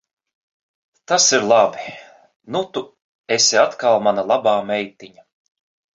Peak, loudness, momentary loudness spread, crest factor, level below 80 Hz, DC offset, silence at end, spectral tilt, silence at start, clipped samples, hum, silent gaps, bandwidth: -2 dBFS; -17 LUFS; 15 LU; 18 dB; -66 dBFS; under 0.1%; 0.9 s; -1.5 dB/octave; 1.1 s; under 0.1%; none; 2.36-2.40 s, 3.02-3.24 s; 7.8 kHz